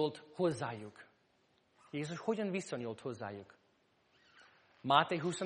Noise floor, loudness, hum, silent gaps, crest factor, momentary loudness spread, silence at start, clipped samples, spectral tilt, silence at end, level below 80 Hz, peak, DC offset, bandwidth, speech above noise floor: -74 dBFS; -37 LUFS; none; none; 28 dB; 16 LU; 0 s; under 0.1%; -5 dB/octave; 0 s; -82 dBFS; -12 dBFS; under 0.1%; 10 kHz; 37 dB